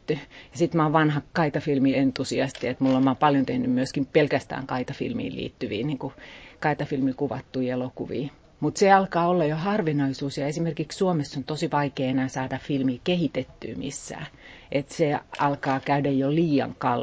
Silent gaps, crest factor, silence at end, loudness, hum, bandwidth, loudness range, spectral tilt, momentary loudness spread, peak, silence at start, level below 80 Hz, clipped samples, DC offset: none; 20 dB; 0 s; -25 LUFS; none; 8 kHz; 6 LU; -6.5 dB/octave; 11 LU; -4 dBFS; 0.1 s; -56 dBFS; under 0.1%; under 0.1%